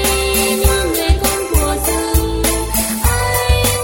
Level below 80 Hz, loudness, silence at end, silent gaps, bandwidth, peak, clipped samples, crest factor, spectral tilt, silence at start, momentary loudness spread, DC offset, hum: -20 dBFS; -15 LUFS; 0 s; none; 17 kHz; -2 dBFS; under 0.1%; 14 dB; -3.5 dB/octave; 0 s; 3 LU; under 0.1%; none